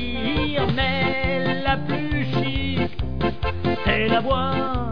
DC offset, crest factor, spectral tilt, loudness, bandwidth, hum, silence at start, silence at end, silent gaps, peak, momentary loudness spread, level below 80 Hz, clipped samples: 3%; 16 dB; -8 dB/octave; -23 LUFS; 5.4 kHz; none; 0 s; 0 s; none; -6 dBFS; 5 LU; -34 dBFS; under 0.1%